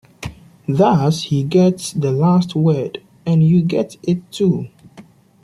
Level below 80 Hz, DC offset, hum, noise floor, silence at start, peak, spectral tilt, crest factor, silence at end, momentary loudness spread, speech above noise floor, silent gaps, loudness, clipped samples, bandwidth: -50 dBFS; under 0.1%; none; -44 dBFS; 0.2 s; -2 dBFS; -7.5 dB/octave; 14 dB; 0.45 s; 15 LU; 29 dB; none; -17 LUFS; under 0.1%; 12 kHz